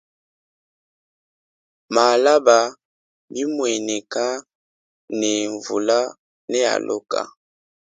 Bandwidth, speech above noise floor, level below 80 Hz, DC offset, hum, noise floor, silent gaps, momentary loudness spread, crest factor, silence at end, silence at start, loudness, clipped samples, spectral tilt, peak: 9.6 kHz; over 71 dB; -74 dBFS; under 0.1%; none; under -90 dBFS; 2.85-3.28 s, 4.55-5.08 s, 6.19-6.48 s; 15 LU; 22 dB; 0.6 s; 1.9 s; -20 LUFS; under 0.1%; -2 dB/octave; 0 dBFS